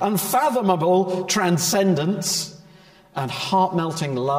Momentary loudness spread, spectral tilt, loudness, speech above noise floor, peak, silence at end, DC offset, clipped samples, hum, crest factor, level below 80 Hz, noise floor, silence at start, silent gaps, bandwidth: 8 LU; -4.5 dB/octave; -21 LUFS; 29 dB; -4 dBFS; 0 s; under 0.1%; under 0.1%; none; 16 dB; -64 dBFS; -49 dBFS; 0 s; none; 16 kHz